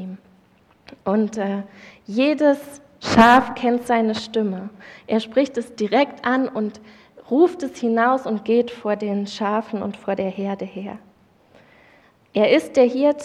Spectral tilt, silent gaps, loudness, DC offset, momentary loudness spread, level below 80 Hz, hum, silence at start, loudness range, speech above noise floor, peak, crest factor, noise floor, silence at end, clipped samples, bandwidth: -5.5 dB/octave; none; -20 LUFS; under 0.1%; 14 LU; -56 dBFS; none; 0 s; 6 LU; 36 dB; -2 dBFS; 20 dB; -56 dBFS; 0 s; under 0.1%; 13.5 kHz